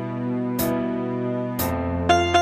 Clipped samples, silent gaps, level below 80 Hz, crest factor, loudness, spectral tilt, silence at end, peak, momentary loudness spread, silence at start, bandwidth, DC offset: under 0.1%; none; -44 dBFS; 18 dB; -24 LUFS; -5.5 dB/octave; 0 s; -4 dBFS; 6 LU; 0 s; 15.5 kHz; under 0.1%